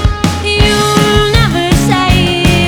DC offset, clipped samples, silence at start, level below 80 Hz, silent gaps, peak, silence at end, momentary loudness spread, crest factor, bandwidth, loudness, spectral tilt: under 0.1%; 0.5%; 0 s; -18 dBFS; none; 0 dBFS; 0 s; 3 LU; 10 dB; over 20 kHz; -10 LUFS; -5 dB/octave